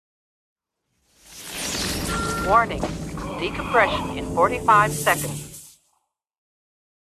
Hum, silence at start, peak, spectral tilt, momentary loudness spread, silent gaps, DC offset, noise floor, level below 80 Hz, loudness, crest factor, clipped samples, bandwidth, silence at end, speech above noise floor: none; 1.3 s; -4 dBFS; -3.5 dB/octave; 16 LU; none; under 0.1%; -73 dBFS; -42 dBFS; -22 LUFS; 20 dB; under 0.1%; 14.5 kHz; 1.4 s; 53 dB